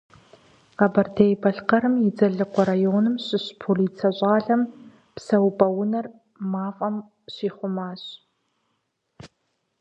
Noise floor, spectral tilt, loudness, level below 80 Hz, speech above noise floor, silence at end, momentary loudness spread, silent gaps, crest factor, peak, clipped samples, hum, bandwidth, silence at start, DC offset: -74 dBFS; -8 dB/octave; -23 LUFS; -66 dBFS; 52 dB; 0.55 s; 14 LU; none; 22 dB; -2 dBFS; under 0.1%; none; 8 kHz; 0.8 s; under 0.1%